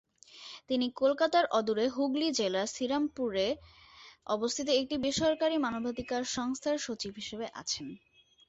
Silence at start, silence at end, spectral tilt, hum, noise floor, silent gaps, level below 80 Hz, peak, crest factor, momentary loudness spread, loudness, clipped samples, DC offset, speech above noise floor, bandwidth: 0.35 s; 0.5 s; -3 dB/octave; none; -51 dBFS; none; -64 dBFS; -14 dBFS; 18 dB; 11 LU; -31 LUFS; under 0.1%; under 0.1%; 20 dB; 8.2 kHz